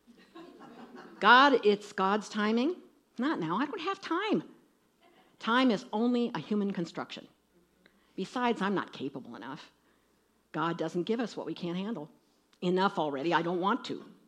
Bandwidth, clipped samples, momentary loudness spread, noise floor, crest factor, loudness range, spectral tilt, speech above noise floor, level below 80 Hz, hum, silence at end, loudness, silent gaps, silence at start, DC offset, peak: 10.5 kHz; under 0.1%; 18 LU; -70 dBFS; 24 dB; 10 LU; -5.5 dB/octave; 40 dB; -82 dBFS; none; 0.2 s; -30 LUFS; none; 0.35 s; under 0.1%; -8 dBFS